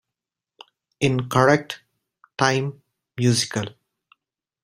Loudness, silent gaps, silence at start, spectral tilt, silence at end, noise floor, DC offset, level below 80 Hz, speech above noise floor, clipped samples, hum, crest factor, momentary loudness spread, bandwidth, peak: -21 LUFS; none; 1 s; -5 dB/octave; 0.95 s; -87 dBFS; under 0.1%; -58 dBFS; 67 dB; under 0.1%; none; 24 dB; 18 LU; 16 kHz; 0 dBFS